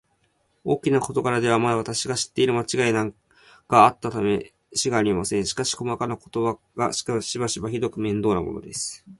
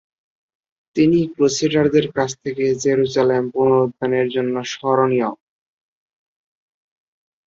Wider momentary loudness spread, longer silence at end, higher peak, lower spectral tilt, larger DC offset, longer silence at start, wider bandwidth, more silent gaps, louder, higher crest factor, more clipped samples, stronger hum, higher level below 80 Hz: about the same, 8 LU vs 7 LU; second, 0.05 s vs 2.15 s; about the same, -2 dBFS vs -2 dBFS; about the same, -4.5 dB/octave vs -5.5 dB/octave; neither; second, 0.65 s vs 0.95 s; first, 11.5 kHz vs 7.8 kHz; neither; second, -23 LUFS vs -18 LUFS; first, 22 dB vs 16 dB; neither; neither; about the same, -54 dBFS vs -58 dBFS